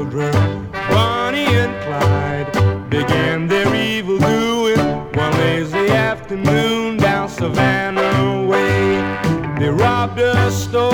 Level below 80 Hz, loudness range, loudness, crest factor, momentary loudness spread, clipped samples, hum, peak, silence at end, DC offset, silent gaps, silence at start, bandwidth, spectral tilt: -40 dBFS; 1 LU; -16 LUFS; 14 dB; 4 LU; under 0.1%; none; -2 dBFS; 0 s; under 0.1%; none; 0 s; over 20 kHz; -6 dB/octave